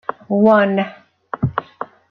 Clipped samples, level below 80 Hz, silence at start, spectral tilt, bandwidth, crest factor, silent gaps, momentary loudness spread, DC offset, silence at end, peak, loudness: under 0.1%; -50 dBFS; 0.1 s; -9.5 dB/octave; 5.2 kHz; 16 dB; none; 20 LU; under 0.1%; 0.25 s; -2 dBFS; -17 LUFS